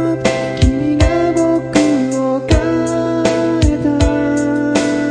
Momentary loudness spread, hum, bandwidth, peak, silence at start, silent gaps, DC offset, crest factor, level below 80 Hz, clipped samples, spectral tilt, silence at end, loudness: 3 LU; none; 10.5 kHz; 0 dBFS; 0 s; none; under 0.1%; 14 dB; -24 dBFS; under 0.1%; -6 dB/octave; 0 s; -15 LUFS